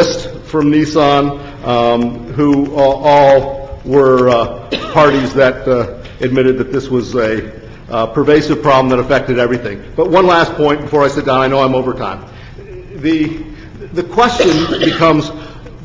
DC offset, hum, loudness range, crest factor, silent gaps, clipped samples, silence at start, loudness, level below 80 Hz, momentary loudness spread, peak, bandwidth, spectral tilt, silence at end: under 0.1%; none; 4 LU; 12 dB; none; under 0.1%; 0 s; -12 LUFS; -36 dBFS; 14 LU; 0 dBFS; 7.6 kHz; -6 dB/octave; 0 s